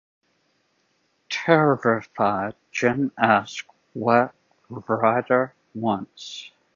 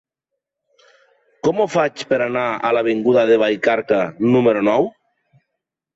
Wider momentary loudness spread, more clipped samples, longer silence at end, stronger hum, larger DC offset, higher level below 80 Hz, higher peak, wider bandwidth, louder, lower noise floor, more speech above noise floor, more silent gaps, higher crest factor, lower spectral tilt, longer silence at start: first, 17 LU vs 5 LU; neither; second, 0.3 s vs 1.05 s; neither; neither; about the same, -64 dBFS vs -62 dBFS; first, 0 dBFS vs -4 dBFS; about the same, 7.6 kHz vs 8 kHz; second, -22 LUFS vs -17 LUFS; second, -68 dBFS vs -81 dBFS; second, 46 dB vs 64 dB; neither; first, 22 dB vs 16 dB; about the same, -6 dB/octave vs -6 dB/octave; second, 1.3 s vs 1.45 s